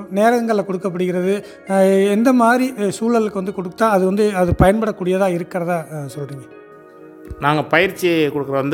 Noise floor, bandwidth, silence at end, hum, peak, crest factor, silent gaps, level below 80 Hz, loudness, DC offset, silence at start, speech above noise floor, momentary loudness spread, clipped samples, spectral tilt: -41 dBFS; 17 kHz; 0 s; none; 0 dBFS; 18 dB; none; -40 dBFS; -17 LUFS; under 0.1%; 0 s; 24 dB; 11 LU; under 0.1%; -6 dB/octave